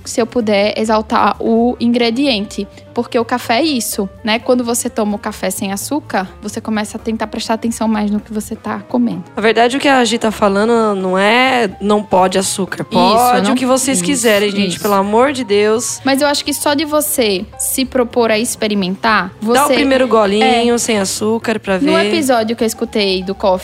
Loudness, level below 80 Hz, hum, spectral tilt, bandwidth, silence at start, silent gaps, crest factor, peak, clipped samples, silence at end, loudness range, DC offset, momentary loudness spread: -14 LUFS; -44 dBFS; none; -3.5 dB/octave; 16 kHz; 0.05 s; none; 14 dB; 0 dBFS; under 0.1%; 0 s; 5 LU; under 0.1%; 8 LU